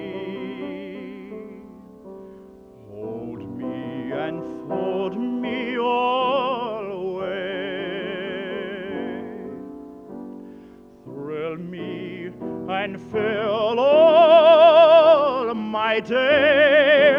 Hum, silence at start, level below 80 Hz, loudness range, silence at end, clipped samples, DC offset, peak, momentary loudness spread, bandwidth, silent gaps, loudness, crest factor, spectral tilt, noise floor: none; 0 s; -62 dBFS; 19 LU; 0 s; under 0.1%; under 0.1%; -4 dBFS; 24 LU; 5.6 kHz; none; -19 LUFS; 18 dB; -6.5 dB/octave; -45 dBFS